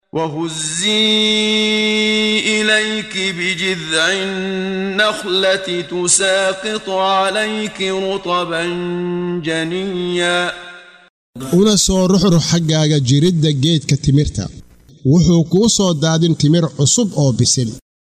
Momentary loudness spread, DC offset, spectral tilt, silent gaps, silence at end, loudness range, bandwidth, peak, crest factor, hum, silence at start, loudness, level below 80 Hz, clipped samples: 8 LU; under 0.1%; -4 dB/octave; 11.10-11.33 s; 0.35 s; 5 LU; 14.5 kHz; 0 dBFS; 14 dB; none; 0.15 s; -15 LUFS; -40 dBFS; under 0.1%